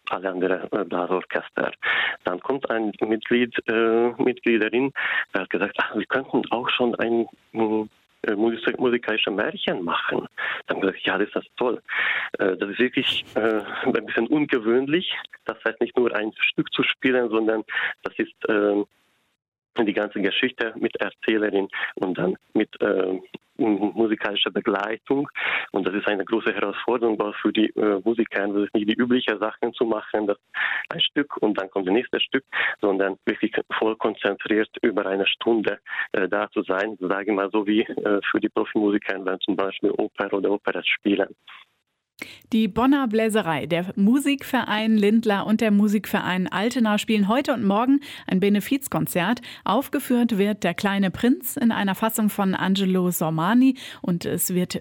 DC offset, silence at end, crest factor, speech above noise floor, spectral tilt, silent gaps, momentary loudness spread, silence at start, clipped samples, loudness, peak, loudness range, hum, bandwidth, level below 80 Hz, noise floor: under 0.1%; 0 s; 14 dB; 51 dB; -5 dB/octave; 19.48-19.52 s; 6 LU; 0.05 s; under 0.1%; -23 LUFS; -10 dBFS; 3 LU; none; 16.5 kHz; -62 dBFS; -74 dBFS